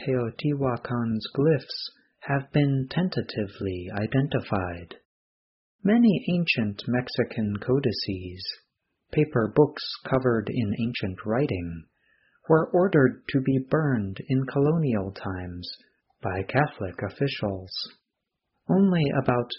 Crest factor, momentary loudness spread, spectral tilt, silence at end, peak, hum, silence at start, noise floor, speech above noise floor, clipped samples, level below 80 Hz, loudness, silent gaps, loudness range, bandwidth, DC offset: 20 dB; 13 LU; -6 dB/octave; 0 s; -6 dBFS; none; 0 s; -82 dBFS; 57 dB; under 0.1%; -56 dBFS; -26 LUFS; 5.05-5.79 s; 4 LU; 5.8 kHz; under 0.1%